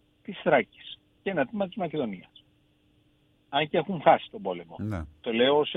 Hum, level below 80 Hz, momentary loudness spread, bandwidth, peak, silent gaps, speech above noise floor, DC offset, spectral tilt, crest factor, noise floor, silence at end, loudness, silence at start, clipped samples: none; -56 dBFS; 15 LU; 4.1 kHz; -6 dBFS; none; 39 dB; under 0.1%; -7.5 dB/octave; 24 dB; -65 dBFS; 0 s; -28 LUFS; 0.3 s; under 0.1%